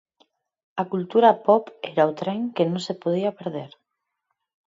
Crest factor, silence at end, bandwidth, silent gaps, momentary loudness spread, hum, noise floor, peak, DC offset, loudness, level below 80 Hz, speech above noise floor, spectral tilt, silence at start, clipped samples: 20 dB; 1 s; 7.8 kHz; none; 15 LU; none; -80 dBFS; -4 dBFS; under 0.1%; -23 LUFS; -76 dBFS; 58 dB; -7 dB/octave; 0.75 s; under 0.1%